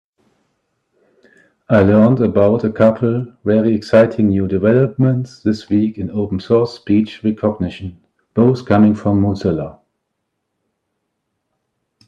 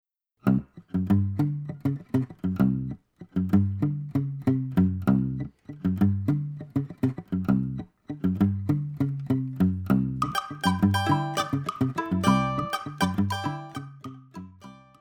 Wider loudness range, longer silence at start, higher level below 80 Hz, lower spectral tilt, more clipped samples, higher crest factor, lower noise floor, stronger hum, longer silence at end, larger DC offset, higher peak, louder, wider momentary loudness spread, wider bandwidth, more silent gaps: first, 5 LU vs 2 LU; first, 1.7 s vs 0.45 s; about the same, -54 dBFS vs -52 dBFS; first, -9 dB/octave vs -7 dB/octave; neither; about the same, 16 dB vs 20 dB; first, -73 dBFS vs -49 dBFS; neither; first, 2.35 s vs 0.25 s; neither; first, 0 dBFS vs -6 dBFS; first, -15 LUFS vs -27 LUFS; about the same, 10 LU vs 12 LU; second, 7.6 kHz vs 17 kHz; neither